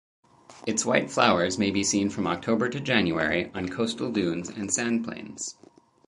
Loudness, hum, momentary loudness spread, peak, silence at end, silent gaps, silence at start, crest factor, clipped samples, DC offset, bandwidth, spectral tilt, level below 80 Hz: -26 LUFS; none; 12 LU; -6 dBFS; 0.55 s; none; 0.5 s; 22 dB; under 0.1%; under 0.1%; 11.5 kHz; -3.5 dB/octave; -56 dBFS